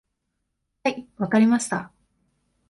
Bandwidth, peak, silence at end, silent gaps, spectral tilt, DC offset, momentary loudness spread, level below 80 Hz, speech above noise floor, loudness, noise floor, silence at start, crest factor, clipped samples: 11.5 kHz; -8 dBFS; 0.8 s; none; -5 dB/octave; under 0.1%; 11 LU; -66 dBFS; 56 dB; -23 LUFS; -77 dBFS; 0.85 s; 18 dB; under 0.1%